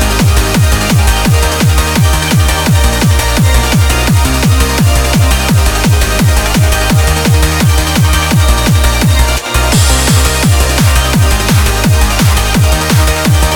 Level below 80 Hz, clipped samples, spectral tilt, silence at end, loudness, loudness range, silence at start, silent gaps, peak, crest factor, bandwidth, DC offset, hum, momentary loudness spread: -14 dBFS; under 0.1%; -4.5 dB/octave; 0 s; -9 LUFS; 0 LU; 0 s; none; 0 dBFS; 8 dB; over 20 kHz; 0.6%; none; 1 LU